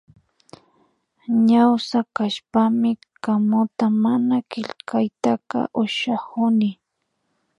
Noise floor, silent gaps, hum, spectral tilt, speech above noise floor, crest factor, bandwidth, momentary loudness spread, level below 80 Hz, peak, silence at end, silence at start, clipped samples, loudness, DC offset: -74 dBFS; none; none; -6.5 dB/octave; 54 dB; 18 dB; 9.8 kHz; 8 LU; -68 dBFS; -4 dBFS; 0.85 s; 1.3 s; under 0.1%; -21 LUFS; under 0.1%